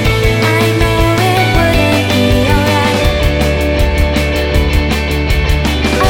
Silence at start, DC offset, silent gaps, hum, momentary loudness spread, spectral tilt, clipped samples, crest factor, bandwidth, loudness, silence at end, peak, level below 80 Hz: 0 s; under 0.1%; none; none; 3 LU; -5.5 dB/octave; under 0.1%; 10 dB; 17 kHz; -12 LUFS; 0 s; 0 dBFS; -16 dBFS